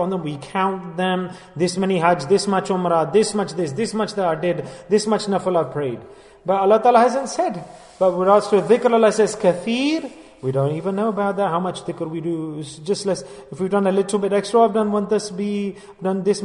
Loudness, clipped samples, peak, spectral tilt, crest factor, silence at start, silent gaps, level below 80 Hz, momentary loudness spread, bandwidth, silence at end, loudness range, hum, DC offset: -20 LUFS; under 0.1%; -2 dBFS; -5.5 dB/octave; 18 dB; 0 s; none; -60 dBFS; 12 LU; 11 kHz; 0 s; 6 LU; none; under 0.1%